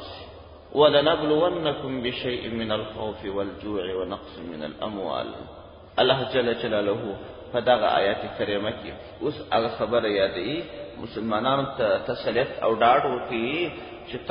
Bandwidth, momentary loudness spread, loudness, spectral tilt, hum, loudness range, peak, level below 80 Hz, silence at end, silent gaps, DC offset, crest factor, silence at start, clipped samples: 5.4 kHz; 15 LU; -25 LUFS; -9.5 dB/octave; none; 6 LU; -4 dBFS; -52 dBFS; 0 s; none; under 0.1%; 22 dB; 0 s; under 0.1%